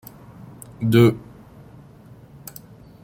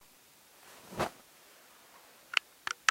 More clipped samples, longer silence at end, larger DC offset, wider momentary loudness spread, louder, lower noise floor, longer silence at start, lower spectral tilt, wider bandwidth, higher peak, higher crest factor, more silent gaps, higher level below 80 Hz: neither; first, 1.85 s vs 0.5 s; neither; first, 27 LU vs 24 LU; first, -18 LUFS vs -35 LUFS; second, -46 dBFS vs -61 dBFS; about the same, 0.8 s vs 0.9 s; first, -7.5 dB/octave vs -1.5 dB/octave; about the same, 16.5 kHz vs 16 kHz; about the same, -2 dBFS vs -4 dBFS; second, 22 dB vs 34 dB; neither; first, -54 dBFS vs -68 dBFS